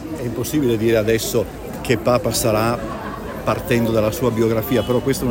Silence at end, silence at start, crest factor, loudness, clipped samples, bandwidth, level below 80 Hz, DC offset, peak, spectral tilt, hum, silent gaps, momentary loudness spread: 0 s; 0 s; 16 dB; -19 LUFS; under 0.1%; 17 kHz; -38 dBFS; under 0.1%; -4 dBFS; -5.5 dB/octave; none; none; 9 LU